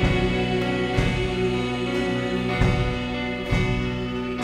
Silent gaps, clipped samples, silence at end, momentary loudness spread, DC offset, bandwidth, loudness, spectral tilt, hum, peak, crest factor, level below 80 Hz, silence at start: none; under 0.1%; 0 s; 5 LU; under 0.1%; 11.5 kHz; -24 LUFS; -6.5 dB/octave; none; -6 dBFS; 18 dB; -32 dBFS; 0 s